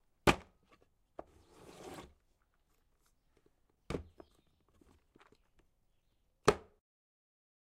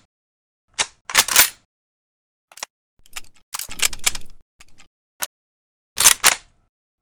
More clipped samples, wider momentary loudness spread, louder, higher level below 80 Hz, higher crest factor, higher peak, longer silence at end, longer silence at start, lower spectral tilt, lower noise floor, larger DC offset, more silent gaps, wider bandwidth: neither; about the same, 24 LU vs 24 LU; second, -36 LUFS vs -16 LUFS; second, -58 dBFS vs -46 dBFS; first, 34 dB vs 24 dB; second, -8 dBFS vs 0 dBFS; first, 1.2 s vs 0.65 s; second, 0.25 s vs 0.8 s; first, -4.5 dB/octave vs 2 dB/octave; second, -76 dBFS vs under -90 dBFS; neither; second, none vs 1.01-1.05 s, 1.65-2.48 s, 2.70-2.97 s, 3.43-3.52 s, 4.42-4.59 s, 4.87-5.20 s, 5.26-5.96 s; second, 15.5 kHz vs over 20 kHz